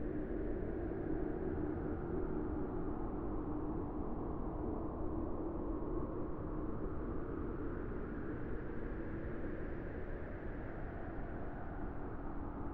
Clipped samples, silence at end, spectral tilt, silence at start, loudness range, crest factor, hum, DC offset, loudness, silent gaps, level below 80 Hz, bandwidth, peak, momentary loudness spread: under 0.1%; 0 s; -11.5 dB/octave; 0 s; 4 LU; 14 dB; none; under 0.1%; -43 LUFS; none; -46 dBFS; 3.7 kHz; -26 dBFS; 6 LU